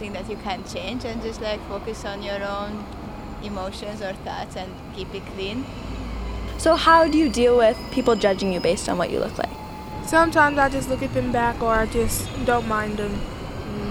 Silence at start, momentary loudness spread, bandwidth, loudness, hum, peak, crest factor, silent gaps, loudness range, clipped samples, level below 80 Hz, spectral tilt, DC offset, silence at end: 0 s; 16 LU; 17 kHz; -23 LUFS; none; -4 dBFS; 20 dB; none; 12 LU; under 0.1%; -36 dBFS; -4.5 dB/octave; under 0.1%; 0 s